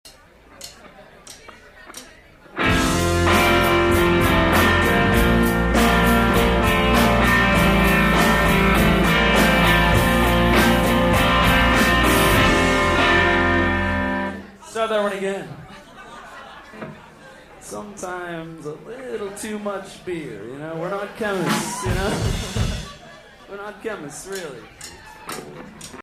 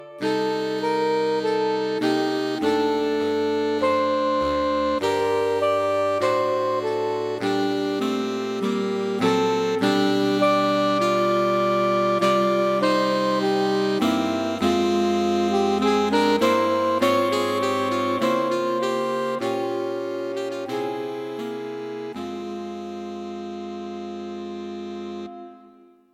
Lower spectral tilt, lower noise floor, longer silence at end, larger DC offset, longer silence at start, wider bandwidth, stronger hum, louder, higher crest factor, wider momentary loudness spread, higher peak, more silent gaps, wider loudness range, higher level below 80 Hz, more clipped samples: about the same, -5 dB/octave vs -5 dB/octave; second, -48 dBFS vs -52 dBFS; second, 0 s vs 0.55 s; neither; about the same, 0.05 s vs 0 s; about the same, 15.5 kHz vs 16 kHz; neither; first, -17 LUFS vs -22 LUFS; about the same, 16 dB vs 14 dB; first, 22 LU vs 13 LU; first, -4 dBFS vs -8 dBFS; neither; first, 16 LU vs 11 LU; first, -30 dBFS vs -58 dBFS; neither